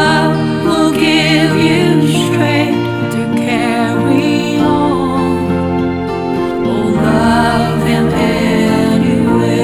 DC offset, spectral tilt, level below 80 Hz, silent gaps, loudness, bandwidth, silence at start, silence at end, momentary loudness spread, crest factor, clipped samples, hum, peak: under 0.1%; -6 dB/octave; -38 dBFS; none; -12 LUFS; 15 kHz; 0 s; 0 s; 5 LU; 12 dB; under 0.1%; none; 0 dBFS